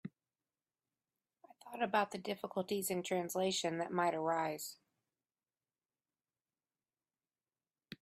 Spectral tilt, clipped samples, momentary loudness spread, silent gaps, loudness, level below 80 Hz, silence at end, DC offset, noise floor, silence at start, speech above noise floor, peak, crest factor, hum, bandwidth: -4 dB/octave; under 0.1%; 12 LU; none; -38 LUFS; -84 dBFS; 0.1 s; under 0.1%; under -90 dBFS; 0.05 s; over 53 dB; -20 dBFS; 22 dB; none; 15.5 kHz